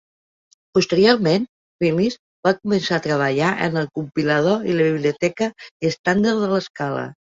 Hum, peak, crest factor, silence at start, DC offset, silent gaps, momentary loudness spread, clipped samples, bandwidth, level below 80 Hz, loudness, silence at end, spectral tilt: none; -2 dBFS; 18 dB; 0.75 s; under 0.1%; 1.49-1.79 s, 2.19-2.43 s, 5.71-5.80 s, 5.99-6.04 s, 6.70-6.74 s; 9 LU; under 0.1%; 7.8 kHz; -58 dBFS; -20 LUFS; 0.25 s; -6 dB/octave